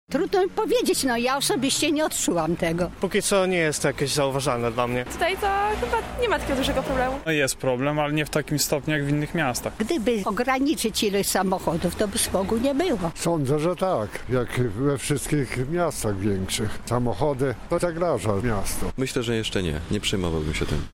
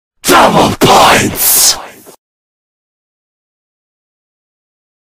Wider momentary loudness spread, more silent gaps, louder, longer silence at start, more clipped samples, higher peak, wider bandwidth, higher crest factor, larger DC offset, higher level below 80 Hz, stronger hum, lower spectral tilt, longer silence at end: about the same, 4 LU vs 4 LU; neither; second, -24 LUFS vs -6 LUFS; second, 0.1 s vs 0.25 s; second, under 0.1% vs 1%; second, -8 dBFS vs 0 dBFS; second, 16.5 kHz vs over 20 kHz; about the same, 16 dB vs 12 dB; neither; about the same, -40 dBFS vs -38 dBFS; neither; first, -4.5 dB/octave vs -2.5 dB/octave; second, 0.05 s vs 3.25 s